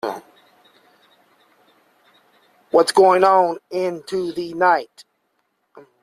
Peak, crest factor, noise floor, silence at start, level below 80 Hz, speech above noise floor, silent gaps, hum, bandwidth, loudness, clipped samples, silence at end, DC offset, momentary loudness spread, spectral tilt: -2 dBFS; 18 dB; -70 dBFS; 0.05 s; -66 dBFS; 52 dB; none; none; 14 kHz; -18 LUFS; under 0.1%; 0.2 s; under 0.1%; 14 LU; -4.5 dB/octave